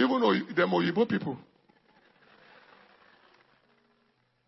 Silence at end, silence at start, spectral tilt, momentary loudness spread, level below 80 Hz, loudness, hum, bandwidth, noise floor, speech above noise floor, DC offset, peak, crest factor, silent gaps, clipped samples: 3.1 s; 0 s; -8 dB/octave; 11 LU; -76 dBFS; -27 LUFS; none; 6 kHz; -71 dBFS; 44 dB; under 0.1%; -12 dBFS; 20 dB; none; under 0.1%